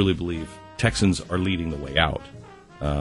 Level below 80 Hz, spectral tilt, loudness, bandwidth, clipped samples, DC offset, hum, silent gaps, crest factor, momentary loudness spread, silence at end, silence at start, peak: -38 dBFS; -5.5 dB/octave; -25 LUFS; 11.5 kHz; under 0.1%; under 0.1%; none; none; 20 dB; 14 LU; 0 s; 0 s; -4 dBFS